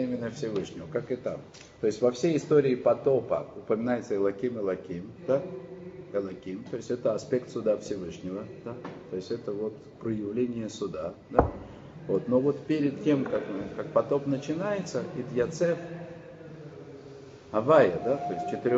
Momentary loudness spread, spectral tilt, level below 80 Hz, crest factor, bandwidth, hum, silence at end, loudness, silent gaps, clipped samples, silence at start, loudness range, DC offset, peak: 16 LU; -6.5 dB/octave; -54 dBFS; 26 dB; 8 kHz; none; 0 s; -29 LUFS; none; under 0.1%; 0 s; 6 LU; under 0.1%; -4 dBFS